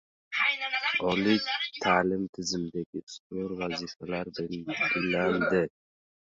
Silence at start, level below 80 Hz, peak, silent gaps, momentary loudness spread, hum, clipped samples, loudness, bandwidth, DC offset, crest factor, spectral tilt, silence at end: 0.3 s; -62 dBFS; -10 dBFS; 2.29-2.33 s, 2.86-2.93 s, 3.03-3.07 s, 3.20-3.30 s; 10 LU; none; under 0.1%; -29 LUFS; 7.8 kHz; under 0.1%; 20 dB; -4.5 dB/octave; 0.6 s